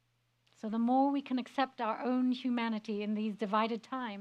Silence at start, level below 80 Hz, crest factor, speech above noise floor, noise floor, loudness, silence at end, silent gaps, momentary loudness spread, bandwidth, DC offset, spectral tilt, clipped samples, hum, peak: 0.65 s; -88 dBFS; 18 dB; 42 dB; -75 dBFS; -34 LUFS; 0 s; none; 8 LU; 8.4 kHz; under 0.1%; -6.5 dB/octave; under 0.1%; none; -16 dBFS